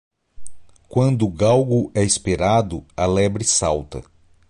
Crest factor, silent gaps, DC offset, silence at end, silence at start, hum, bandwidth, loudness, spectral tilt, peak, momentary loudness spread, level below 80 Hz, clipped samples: 16 dB; none; under 0.1%; 0.5 s; 0.4 s; none; 11.5 kHz; -19 LUFS; -5 dB/octave; -4 dBFS; 9 LU; -40 dBFS; under 0.1%